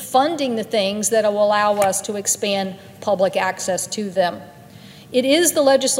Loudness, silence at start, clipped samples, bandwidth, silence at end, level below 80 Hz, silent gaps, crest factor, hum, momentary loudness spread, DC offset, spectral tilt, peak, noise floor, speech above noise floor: -19 LUFS; 0 s; under 0.1%; 16 kHz; 0 s; -66 dBFS; none; 16 dB; none; 8 LU; under 0.1%; -2.5 dB/octave; -2 dBFS; -42 dBFS; 23 dB